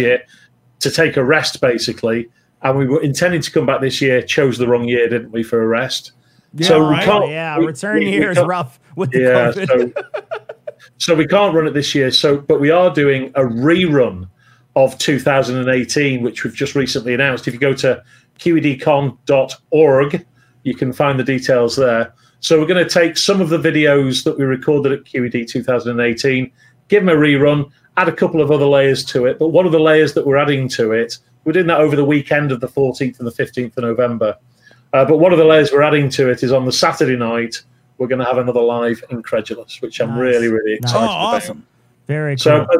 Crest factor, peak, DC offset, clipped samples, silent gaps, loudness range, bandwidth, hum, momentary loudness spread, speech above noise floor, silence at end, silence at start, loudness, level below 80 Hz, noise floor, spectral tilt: 14 dB; 0 dBFS; under 0.1%; under 0.1%; none; 4 LU; 16 kHz; none; 10 LU; 20 dB; 0 s; 0 s; -15 LUFS; -54 dBFS; -34 dBFS; -5.5 dB/octave